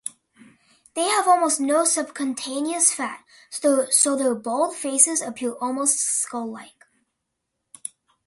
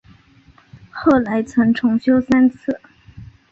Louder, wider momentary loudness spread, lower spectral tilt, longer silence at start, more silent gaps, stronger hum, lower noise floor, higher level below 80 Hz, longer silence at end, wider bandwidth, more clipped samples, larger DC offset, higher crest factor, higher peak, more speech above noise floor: second, -21 LUFS vs -17 LUFS; first, 18 LU vs 11 LU; second, -1 dB/octave vs -7 dB/octave; second, 0.05 s vs 0.95 s; neither; neither; first, -79 dBFS vs -50 dBFS; second, -74 dBFS vs -48 dBFS; first, 1.55 s vs 0.25 s; first, 12 kHz vs 7.6 kHz; neither; neither; first, 24 dB vs 16 dB; about the same, 0 dBFS vs -2 dBFS; first, 57 dB vs 35 dB